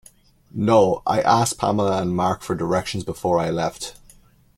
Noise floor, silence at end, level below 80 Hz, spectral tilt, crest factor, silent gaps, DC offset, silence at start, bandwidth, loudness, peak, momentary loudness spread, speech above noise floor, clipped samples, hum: -52 dBFS; 0.65 s; -50 dBFS; -5.5 dB/octave; 18 dB; none; under 0.1%; 0.55 s; 16 kHz; -21 LUFS; -4 dBFS; 11 LU; 32 dB; under 0.1%; none